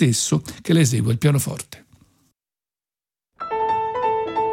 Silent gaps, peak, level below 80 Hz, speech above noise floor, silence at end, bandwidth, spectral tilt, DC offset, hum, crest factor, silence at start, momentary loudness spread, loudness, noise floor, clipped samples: none; -6 dBFS; -56 dBFS; over 71 dB; 0 s; 17 kHz; -5 dB/octave; under 0.1%; none; 16 dB; 0 s; 12 LU; -21 LUFS; under -90 dBFS; under 0.1%